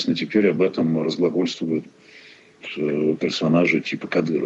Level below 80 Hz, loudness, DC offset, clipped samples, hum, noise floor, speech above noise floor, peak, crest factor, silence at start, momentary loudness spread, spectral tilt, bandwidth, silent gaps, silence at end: -68 dBFS; -21 LUFS; under 0.1%; under 0.1%; none; -48 dBFS; 27 dB; -6 dBFS; 16 dB; 0 s; 8 LU; -6 dB/octave; 8 kHz; none; 0 s